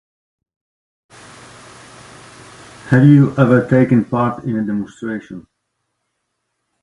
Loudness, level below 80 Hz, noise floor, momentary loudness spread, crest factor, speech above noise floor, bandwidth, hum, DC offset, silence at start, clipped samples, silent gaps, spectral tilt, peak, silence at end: -14 LUFS; -52 dBFS; -73 dBFS; 17 LU; 18 dB; 59 dB; 11 kHz; none; under 0.1%; 2.85 s; under 0.1%; none; -9 dB/octave; 0 dBFS; 1.4 s